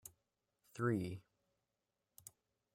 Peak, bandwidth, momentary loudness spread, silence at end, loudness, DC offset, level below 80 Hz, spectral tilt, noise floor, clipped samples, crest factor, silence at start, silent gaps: -24 dBFS; 16 kHz; 20 LU; 1.55 s; -41 LUFS; under 0.1%; -80 dBFS; -6.5 dB/octave; -89 dBFS; under 0.1%; 22 dB; 0.05 s; none